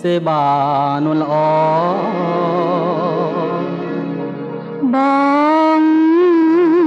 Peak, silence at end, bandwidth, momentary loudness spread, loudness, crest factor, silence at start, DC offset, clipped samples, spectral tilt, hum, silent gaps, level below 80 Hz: -4 dBFS; 0 s; 6.8 kHz; 10 LU; -15 LUFS; 10 dB; 0 s; under 0.1%; under 0.1%; -8.5 dB/octave; none; none; -66 dBFS